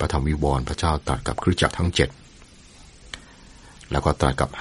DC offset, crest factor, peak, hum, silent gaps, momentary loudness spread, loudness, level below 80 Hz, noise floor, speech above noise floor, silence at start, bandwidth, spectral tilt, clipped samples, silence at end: under 0.1%; 22 dB; -2 dBFS; none; none; 17 LU; -23 LUFS; -32 dBFS; -48 dBFS; 26 dB; 0 s; 11.5 kHz; -5.5 dB/octave; under 0.1%; 0 s